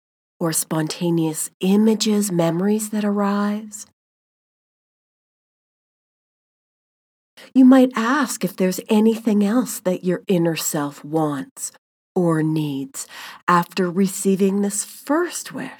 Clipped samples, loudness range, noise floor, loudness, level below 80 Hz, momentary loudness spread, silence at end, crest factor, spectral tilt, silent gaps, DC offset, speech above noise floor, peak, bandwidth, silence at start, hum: under 0.1%; 7 LU; under -90 dBFS; -20 LUFS; -82 dBFS; 11 LU; 0.05 s; 20 dB; -5 dB/octave; 1.54-1.60 s, 3.93-7.37 s, 11.51-11.56 s, 11.78-12.15 s, 13.43-13.47 s; under 0.1%; over 71 dB; -2 dBFS; over 20 kHz; 0.4 s; none